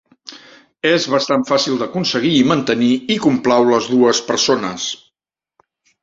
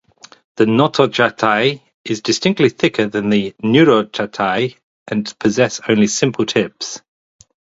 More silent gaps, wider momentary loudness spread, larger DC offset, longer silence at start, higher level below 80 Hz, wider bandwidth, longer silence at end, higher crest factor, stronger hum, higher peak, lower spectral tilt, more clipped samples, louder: second, none vs 1.94-2.04 s, 4.83-5.06 s; about the same, 10 LU vs 10 LU; neither; second, 0.3 s vs 0.55 s; about the same, -58 dBFS vs -56 dBFS; about the same, 7.8 kHz vs 8 kHz; first, 1.1 s vs 0.8 s; about the same, 16 dB vs 16 dB; neither; about the same, -2 dBFS vs 0 dBFS; about the same, -4 dB/octave vs -4.5 dB/octave; neither; about the same, -16 LUFS vs -16 LUFS